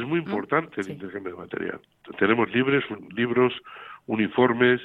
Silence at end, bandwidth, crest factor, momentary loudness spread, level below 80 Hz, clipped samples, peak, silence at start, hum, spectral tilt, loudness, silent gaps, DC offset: 0 s; 7.6 kHz; 20 dB; 15 LU; -66 dBFS; under 0.1%; -6 dBFS; 0 s; none; -7.5 dB/octave; -25 LUFS; none; under 0.1%